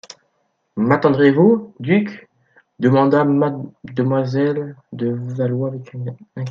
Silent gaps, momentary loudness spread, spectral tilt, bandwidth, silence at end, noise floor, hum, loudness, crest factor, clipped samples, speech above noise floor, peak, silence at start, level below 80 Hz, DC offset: none; 16 LU; -9 dB/octave; 7.2 kHz; 0 s; -68 dBFS; none; -18 LUFS; 18 dB; under 0.1%; 50 dB; 0 dBFS; 0.75 s; -62 dBFS; under 0.1%